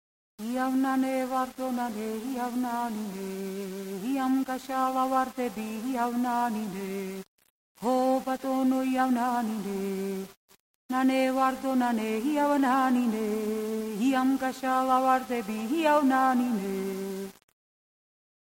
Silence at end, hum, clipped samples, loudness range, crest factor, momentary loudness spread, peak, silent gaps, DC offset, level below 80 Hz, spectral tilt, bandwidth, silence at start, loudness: 1.15 s; none; under 0.1%; 4 LU; 16 dB; 11 LU; -12 dBFS; 7.28-7.38 s, 7.50-7.75 s, 10.37-10.48 s, 10.60-10.89 s; under 0.1%; -68 dBFS; -5 dB/octave; 16.5 kHz; 0.4 s; -28 LUFS